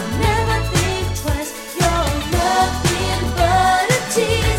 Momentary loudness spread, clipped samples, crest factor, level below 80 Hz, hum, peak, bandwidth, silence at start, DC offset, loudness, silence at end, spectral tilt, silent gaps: 7 LU; under 0.1%; 14 dB; -26 dBFS; none; -4 dBFS; 17 kHz; 0 s; under 0.1%; -18 LUFS; 0 s; -4 dB/octave; none